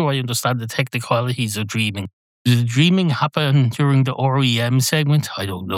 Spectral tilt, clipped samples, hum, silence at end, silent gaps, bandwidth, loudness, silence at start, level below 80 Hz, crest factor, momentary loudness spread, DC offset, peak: -5.5 dB/octave; under 0.1%; none; 0 s; 2.13-2.45 s; 16.5 kHz; -18 LUFS; 0 s; -66 dBFS; 16 dB; 7 LU; under 0.1%; -2 dBFS